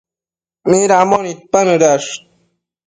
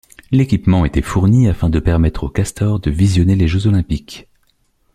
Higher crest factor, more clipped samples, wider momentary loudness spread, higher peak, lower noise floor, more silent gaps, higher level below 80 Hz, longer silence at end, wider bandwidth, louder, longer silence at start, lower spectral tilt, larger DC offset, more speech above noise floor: about the same, 14 dB vs 14 dB; neither; first, 13 LU vs 7 LU; about the same, 0 dBFS vs -2 dBFS; first, under -90 dBFS vs -60 dBFS; neither; second, -58 dBFS vs -28 dBFS; about the same, 0.7 s vs 0.7 s; second, 9.6 kHz vs 13 kHz; about the same, -13 LUFS vs -15 LUFS; first, 0.65 s vs 0.3 s; second, -4 dB/octave vs -7.5 dB/octave; neither; first, over 78 dB vs 46 dB